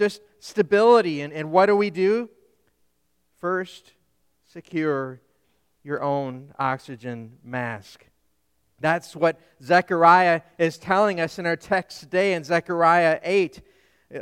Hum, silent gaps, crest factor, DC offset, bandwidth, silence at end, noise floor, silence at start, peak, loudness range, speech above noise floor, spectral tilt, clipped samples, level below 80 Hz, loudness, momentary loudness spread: none; none; 20 dB; under 0.1%; 13.5 kHz; 0 s; -72 dBFS; 0 s; -2 dBFS; 10 LU; 50 dB; -6 dB/octave; under 0.1%; -66 dBFS; -22 LUFS; 17 LU